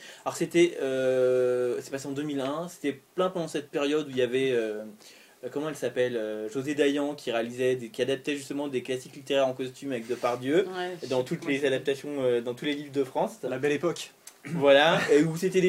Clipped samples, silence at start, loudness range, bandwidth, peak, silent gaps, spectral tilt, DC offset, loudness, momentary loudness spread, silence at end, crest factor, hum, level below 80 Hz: under 0.1%; 0 s; 4 LU; 16 kHz; -6 dBFS; none; -5 dB/octave; under 0.1%; -28 LUFS; 11 LU; 0 s; 20 dB; none; -74 dBFS